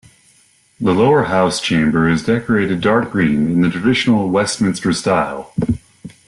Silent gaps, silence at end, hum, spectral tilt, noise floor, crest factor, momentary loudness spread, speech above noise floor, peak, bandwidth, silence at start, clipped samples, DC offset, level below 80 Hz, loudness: none; 0.2 s; none; -5.5 dB/octave; -53 dBFS; 12 dB; 7 LU; 38 dB; -4 dBFS; 12 kHz; 0.8 s; under 0.1%; under 0.1%; -44 dBFS; -16 LUFS